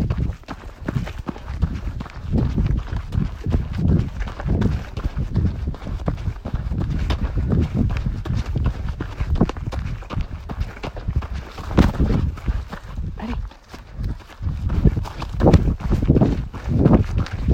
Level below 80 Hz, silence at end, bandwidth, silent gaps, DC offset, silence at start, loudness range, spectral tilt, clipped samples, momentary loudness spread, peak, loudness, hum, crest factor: -26 dBFS; 0 s; 8.8 kHz; none; under 0.1%; 0 s; 5 LU; -8.5 dB/octave; under 0.1%; 13 LU; 0 dBFS; -23 LUFS; none; 22 dB